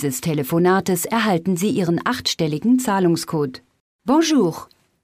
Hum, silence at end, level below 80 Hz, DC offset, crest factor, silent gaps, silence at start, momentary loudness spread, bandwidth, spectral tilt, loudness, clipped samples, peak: none; 0.4 s; -58 dBFS; under 0.1%; 14 dB; 3.80-3.99 s; 0 s; 7 LU; 16 kHz; -5 dB/octave; -19 LUFS; under 0.1%; -6 dBFS